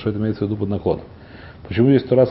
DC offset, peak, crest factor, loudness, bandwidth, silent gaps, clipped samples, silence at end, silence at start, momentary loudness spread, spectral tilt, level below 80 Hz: under 0.1%; -2 dBFS; 18 dB; -20 LUFS; 5.8 kHz; none; under 0.1%; 0 s; 0 s; 25 LU; -13 dB/octave; -42 dBFS